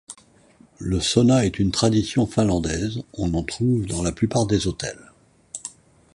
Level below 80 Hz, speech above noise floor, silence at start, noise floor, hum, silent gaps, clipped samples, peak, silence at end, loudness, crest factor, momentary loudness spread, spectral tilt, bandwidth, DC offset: -40 dBFS; 33 dB; 0.1 s; -54 dBFS; none; none; under 0.1%; -4 dBFS; 0.45 s; -22 LUFS; 18 dB; 17 LU; -5.5 dB/octave; 11.5 kHz; under 0.1%